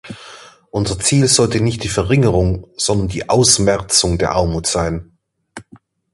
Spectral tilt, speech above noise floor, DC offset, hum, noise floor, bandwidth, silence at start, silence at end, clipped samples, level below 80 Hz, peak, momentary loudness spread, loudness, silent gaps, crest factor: -4 dB/octave; 32 dB; under 0.1%; none; -47 dBFS; 11.5 kHz; 0.05 s; 0.5 s; under 0.1%; -32 dBFS; 0 dBFS; 10 LU; -15 LUFS; none; 16 dB